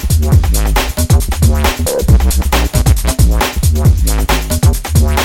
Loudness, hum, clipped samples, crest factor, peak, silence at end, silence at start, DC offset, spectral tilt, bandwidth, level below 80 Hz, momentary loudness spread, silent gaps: -12 LUFS; none; under 0.1%; 10 dB; 0 dBFS; 0 s; 0 s; under 0.1%; -5 dB/octave; 17 kHz; -12 dBFS; 3 LU; none